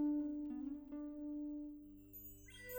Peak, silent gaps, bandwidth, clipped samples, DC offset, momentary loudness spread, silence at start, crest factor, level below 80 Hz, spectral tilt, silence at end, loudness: -32 dBFS; none; over 20 kHz; under 0.1%; under 0.1%; 13 LU; 0 s; 14 dB; -68 dBFS; -5.5 dB/octave; 0 s; -47 LUFS